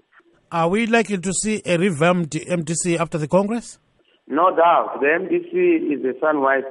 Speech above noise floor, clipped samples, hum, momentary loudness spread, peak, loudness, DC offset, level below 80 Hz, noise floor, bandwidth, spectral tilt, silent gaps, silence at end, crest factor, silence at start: 37 dB; under 0.1%; none; 8 LU; -4 dBFS; -20 LUFS; under 0.1%; -56 dBFS; -56 dBFS; 11.5 kHz; -5 dB/octave; none; 0 s; 16 dB; 0.5 s